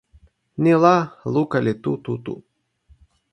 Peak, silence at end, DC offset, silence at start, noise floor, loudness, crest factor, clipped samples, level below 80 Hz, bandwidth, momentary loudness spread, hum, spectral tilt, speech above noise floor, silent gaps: 0 dBFS; 0.95 s; under 0.1%; 0.6 s; -57 dBFS; -20 LUFS; 22 dB; under 0.1%; -58 dBFS; 8.8 kHz; 18 LU; none; -8 dB/octave; 38 dB; none